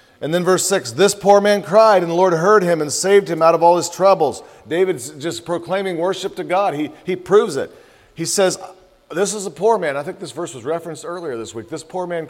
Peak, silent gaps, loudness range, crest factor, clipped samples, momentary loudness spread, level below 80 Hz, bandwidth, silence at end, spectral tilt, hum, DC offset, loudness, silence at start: 0 dBFS; none; 8 LU; 16 dB; under 0.1%; 15 LU; -62 dBFS; 16.5 kHz; 0 s; -4 dB/octave; none; under 0.1%; -17 LUFS; 0.2 s